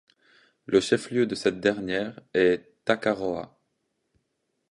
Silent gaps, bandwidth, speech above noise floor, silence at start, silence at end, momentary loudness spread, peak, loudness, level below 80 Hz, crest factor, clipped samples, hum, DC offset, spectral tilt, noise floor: none; 11.5 kHz; 52 dB; 0.7 s; 1.25 s; 7 LU; -6 dBFS; -26 LUFS; -62 dBFS; 20 dB; under 0.1%; none; under 0.1%; -5 dB/octave; -77 dBFS